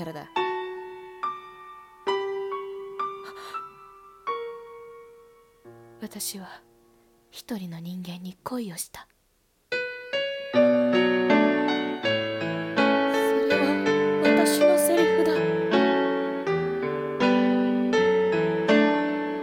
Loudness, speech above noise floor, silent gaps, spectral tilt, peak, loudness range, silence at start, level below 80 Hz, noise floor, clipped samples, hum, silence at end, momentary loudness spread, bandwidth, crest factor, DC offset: -24 LUFS; 37 dB; none; -4.5 dB/octave; -8 dBFS; 16 LU; 0 s; -68 dBFS; -67 dBFS; under 0.1%; none; 0 s; 17 LU; 17.5 kHz; 18 dB; under 0.1%